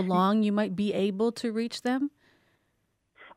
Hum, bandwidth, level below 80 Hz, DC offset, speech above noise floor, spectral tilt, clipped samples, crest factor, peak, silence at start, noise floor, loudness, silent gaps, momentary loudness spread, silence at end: none; 13.5 kHz; -72 dBFS; under 0.1%; 48 dB; -6.5 dB/octave; under 0.1%; 16 dB; -12 dBFS; 0 s; -75 dBFS; -28 LUFS; none; 7 LU; 0.05 s